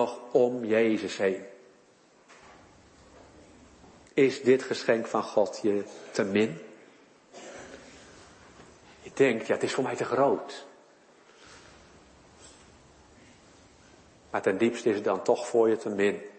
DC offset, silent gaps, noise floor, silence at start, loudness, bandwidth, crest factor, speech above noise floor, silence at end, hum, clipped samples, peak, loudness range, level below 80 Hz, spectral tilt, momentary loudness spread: under 0.1%; none; -60 dBFS; 0 s; -27 LUFS; 8.8 kHz; 20 dB; 34 dB; 0.05 s; none; under 0.1%; -10 dBFS; 7 LU; -68 dBFS; -5 dB/octave; 21 LU